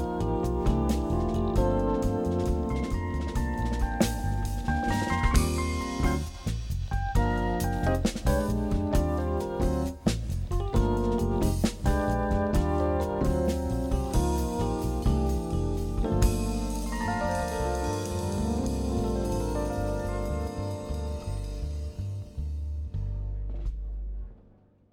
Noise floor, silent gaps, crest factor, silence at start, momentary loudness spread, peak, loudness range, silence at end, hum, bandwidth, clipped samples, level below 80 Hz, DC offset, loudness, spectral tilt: -58 dBFS; none; 18 dB; 0 s; 8 LU; -10 dBFS; 6 LU; 0.5 s; none; 17 kHz; under 0.1%; -32 dBFS; under 0.1%; -29 LUFS; -6.5 dB/octave